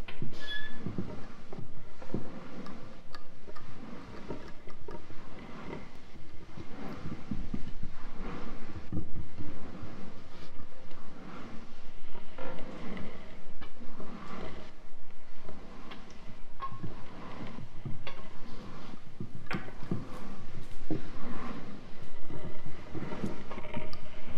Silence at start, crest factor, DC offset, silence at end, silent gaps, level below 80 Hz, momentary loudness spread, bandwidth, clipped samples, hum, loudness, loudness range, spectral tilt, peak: 0 s; 12 dB; under 0.1%; 0 s; none; -44 dBFS; 11 LU; 5.8 kHz; under 0.1%; none; -45 LUFS; 5 LU; -6.5 dB/octave; -14 dBFS